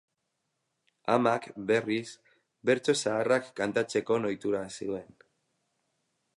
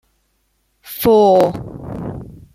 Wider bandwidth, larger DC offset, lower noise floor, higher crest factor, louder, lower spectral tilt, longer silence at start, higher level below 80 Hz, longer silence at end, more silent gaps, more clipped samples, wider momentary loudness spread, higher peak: second, 11.5 kHz vs 16 kHz; neither; first, -81 dBFS vs -64 dBFS; about the same, 20 dB vs 16 dB; second, -29 LUFS vs -13 LUFS; second, -4.5 dB/octave vs -6.5 dB/octave; first, 1.05 s vs 0.85 s; second, -72 dBFS vs -44 dBFS; first, 1.3 s vs 0.25 s; neither; neither; second, 10 LU vs 20 LU; second, -12 dBFS vs -2 dBFS